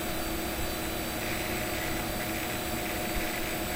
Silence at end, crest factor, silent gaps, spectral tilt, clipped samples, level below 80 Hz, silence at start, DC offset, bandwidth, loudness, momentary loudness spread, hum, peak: 0 s; 14 dB; none; -3.5 dB/octave; under 0.1%; -42 dBFS; 0 s; 0.1%; 16 kHz; -32 LUFS; 1 LU; none; -18 dBFS